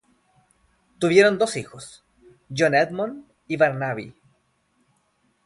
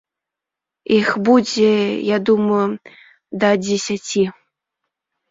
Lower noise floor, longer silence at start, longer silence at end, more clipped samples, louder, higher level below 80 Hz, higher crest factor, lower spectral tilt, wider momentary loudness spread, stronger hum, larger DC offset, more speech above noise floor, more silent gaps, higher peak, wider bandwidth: second, -67 dBFS vs -85 dBFS; about the same, 1 s vs 0.9 s; first, 1.35 s vs 1 s; neither; second, -22 LUFS vs -17 LUFS; about the same, -64 dBFS vs -60 dBFS; first, 22 dB vs 16 dB; about the same, -5 dB/octave vs -5 dB/octave; first, 25 LU vs 8 LU; neither; neither; second, 46 dB vs 69 dB; neither; about the same, -2 dBFS vs -2 dBFS; first, 11.5 kHz vs 7.8 kHz